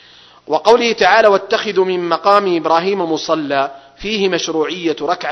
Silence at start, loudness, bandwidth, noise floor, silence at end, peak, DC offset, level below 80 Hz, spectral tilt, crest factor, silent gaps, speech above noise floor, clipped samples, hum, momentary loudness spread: 0.5 s; -15 LUFS; 9.4 kHz; -39 dBFS; 0 s; 0 dBFS; under 0.1%; -52 dBFS; -4 dB/octave; 14 dB; none; 25 dB; 0.2%; none; 8 LU